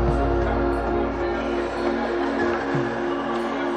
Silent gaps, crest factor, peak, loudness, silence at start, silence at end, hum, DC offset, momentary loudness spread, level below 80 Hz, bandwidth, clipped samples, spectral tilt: none; 14 dB; -10 dBFS; -24 LUFS; 0 s; 0 s; none; under 0.1%; 3 LU; -32 dBFS; 9.8 kHz; under 0.1%; -7 dB/octave